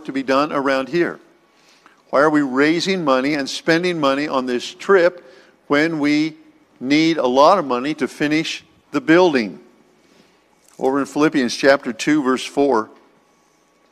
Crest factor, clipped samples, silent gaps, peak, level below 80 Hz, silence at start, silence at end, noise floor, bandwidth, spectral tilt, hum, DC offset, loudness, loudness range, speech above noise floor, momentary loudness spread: 18 dB; under 0.1%; none; 0 dBFS; -62 dBFS; 0 s; 1.05 s; -58 dBFS; 13 kHz; -5 dB/octave; none; under 0.1%; -18 LUFS; 3 LU; 41 dB; 10 LU